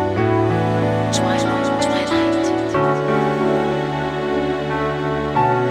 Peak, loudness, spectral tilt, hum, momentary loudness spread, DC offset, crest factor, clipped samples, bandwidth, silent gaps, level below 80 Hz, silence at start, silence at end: -6 dBFS; -19 LUFS; -6 dB/octave; none; 4 LU; under 0.1%; 12 dB; under 0.1%; 13 kHz; none; -42 dBFS; 0 s; 0 s